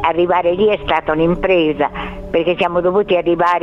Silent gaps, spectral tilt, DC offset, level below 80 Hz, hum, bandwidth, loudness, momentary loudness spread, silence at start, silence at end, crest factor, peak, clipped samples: none; -7.5 dB/octave; under 0.1%; -36 dBFS; none; 6.8 kHz; -15 LUFS; 5 LU; 0 s; 0 s; 14 dB; 0 dBFS; under 0.1%